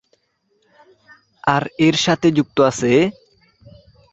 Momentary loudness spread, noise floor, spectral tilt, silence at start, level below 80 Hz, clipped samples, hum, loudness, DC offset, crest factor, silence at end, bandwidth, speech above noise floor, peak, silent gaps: 5 LU; -65 dBFS; -5 dB/octave; 1.45 s; -54 dBFS; under 0.1%; none; -17 LUFS; under 0.1%; 18 dB; 1 s; 8.2 kHz; 49 dB; -2 dBFS; none